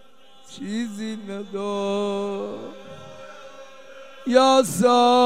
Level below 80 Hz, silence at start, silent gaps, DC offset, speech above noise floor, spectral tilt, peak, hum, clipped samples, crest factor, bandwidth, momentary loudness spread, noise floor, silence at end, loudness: -70 dBFS; 0.5 s; none; 0.5%; 32 dB; -4.5 dB/octave; -4 dBFS; none; under 0.1%; 20 dB; 15.5 kHz; 26 LU; -53 dBFS; 0 s; -22 LUFS